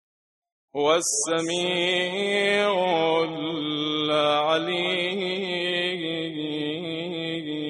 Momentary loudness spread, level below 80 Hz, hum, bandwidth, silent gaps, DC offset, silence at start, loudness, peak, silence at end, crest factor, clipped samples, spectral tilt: 8 LU; -72 dBFS; none; 11.5 kHz; none; under 0.1%; 0.75 s; -24 LUFS; -8 dBFS; 0 s; 18 dB; under 0.1%; -3 dB/octave